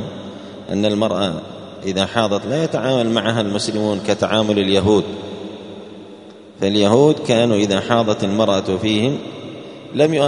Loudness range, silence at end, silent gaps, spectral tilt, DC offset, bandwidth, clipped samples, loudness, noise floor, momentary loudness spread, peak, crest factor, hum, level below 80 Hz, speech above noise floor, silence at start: 3 LU; 0 s; none; -5.5 dB/octave; under 0.1%; 10.5 kHz; under 0.1%; -18 LUFS; -39 dBFS; 19 LU; 0 dBFS; 18 dB; none; -54 dBFS; 22 dB; 0 s